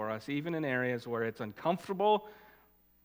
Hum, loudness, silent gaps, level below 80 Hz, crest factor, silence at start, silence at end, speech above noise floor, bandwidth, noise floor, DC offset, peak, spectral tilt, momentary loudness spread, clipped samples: none; -33 LUFS; none; -74 dBFS; 18 dB; 0 s; 0.6 s; 32 dB; 16.5 kHz; -66 dBFS; under 0.1%; -16 dBFS; -6.5 dB/octave; 7 LU; under 0.1%